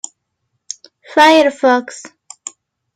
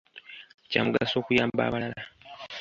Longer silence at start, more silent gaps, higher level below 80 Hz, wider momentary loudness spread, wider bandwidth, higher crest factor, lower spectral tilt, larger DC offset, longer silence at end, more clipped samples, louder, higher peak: first, 1.1 s vs 0.15 s; second, none vs 0.54-0.58 s; second, -66 dBFS vs -58 dBFS; first, 23 LU vs 20 LU; first, 15.5 kHz vs 7.6 kHz; second, 16 dB vs 24 dB; second, -1.5 dB/octave vs -6 dB/octave; neither; first, 0.9 s vs 0 s; neither; first, -12 LUFS vs -27 LUFS; first, 0 dBFS vs -6 dBFS